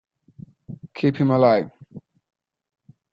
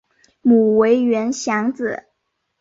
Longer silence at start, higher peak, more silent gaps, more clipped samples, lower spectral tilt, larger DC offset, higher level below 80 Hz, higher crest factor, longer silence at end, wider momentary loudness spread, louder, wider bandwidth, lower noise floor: first, 0.7 s vs 0.45 s; about the same, -4 dBFS vs -4 dBFS; neither; neither; first, -9.5 dB/octave vs -5.5 dB/octave; neither; about the same, -64 dBFS vs -62 dBFS; first, 20 dB vs 14 dB; first, 1.15 s vs 0.65 s; first, 23 LU vs 12 LU; about the same, -19 LUFS vs -17 LUFS; second, 6.8 kHz vs 7.8 kHz; second, -46 dBFS vs -73 dBFS